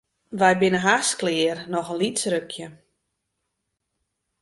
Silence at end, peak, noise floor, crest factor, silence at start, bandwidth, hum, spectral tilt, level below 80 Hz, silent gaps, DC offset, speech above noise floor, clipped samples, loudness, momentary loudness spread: 1.65 s; -4 dBFS; -79 dBFS; 22 dB; 0.3 s; 11.5 kHz; none; -3.5 dB/octave; -64 dBFS; none; under 0.1%; 56 dB; under 0.1%; -22 LUFS; 17 LU